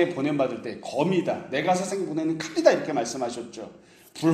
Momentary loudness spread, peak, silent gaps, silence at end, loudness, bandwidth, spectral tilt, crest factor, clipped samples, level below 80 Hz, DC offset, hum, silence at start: 16 LU; -4 dBFS; none; 0 s; -26 LUFS; 14.5 kHz; -5 dB/octave; 22 dB; under 0.1%; -68 dBFS; under 0.1%; none; 0 s